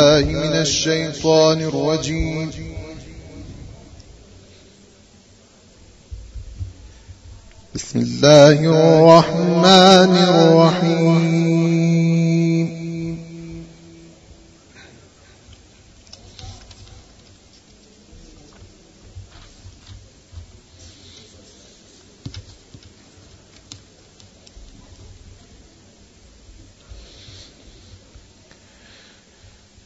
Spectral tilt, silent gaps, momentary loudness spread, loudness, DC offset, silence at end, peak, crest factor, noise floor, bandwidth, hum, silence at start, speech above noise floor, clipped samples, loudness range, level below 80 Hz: -5.5 dB/octave; none; 29 LU; -14 LUFS; under 0.1%; 2.85 s; 0 dBFS; 20 dB; -49 dBFS; 8 kHz; none; 0 s; 36 dB; under 0.1%; 22 LU; -44 dBFS